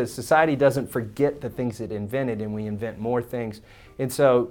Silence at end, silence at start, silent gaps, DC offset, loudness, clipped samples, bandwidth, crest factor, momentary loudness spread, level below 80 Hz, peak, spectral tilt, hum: 0 s; 0 s; none; under 0.1%; -25 LUFS; under 0.1%; 18.5 kHz; 18 dB; 12 LU; -54 dBFS; -6 dBFS; -6 dB/octave; none